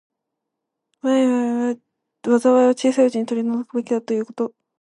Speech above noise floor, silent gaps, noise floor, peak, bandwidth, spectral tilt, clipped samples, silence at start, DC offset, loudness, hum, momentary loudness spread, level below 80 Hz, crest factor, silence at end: 62 dB; none; -81 dBFS; -4 dBFS; 11 kHz; -5 dB/octave; under 0.1%; 1.05 s; under 0.1%; -20 LUFS; none; 12 LU; -76 dBFS; 16 dB; 0.3 s